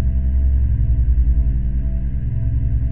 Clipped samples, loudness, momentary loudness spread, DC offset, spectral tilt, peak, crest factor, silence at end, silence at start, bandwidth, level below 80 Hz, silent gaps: under 0.1%; -20 LUFS; 5 LU; under 0.1%; -13 dB/octave; -6 dBFS; 10 dB; 0 s; 0 s; 2.1 kHz; -18 dBFS; none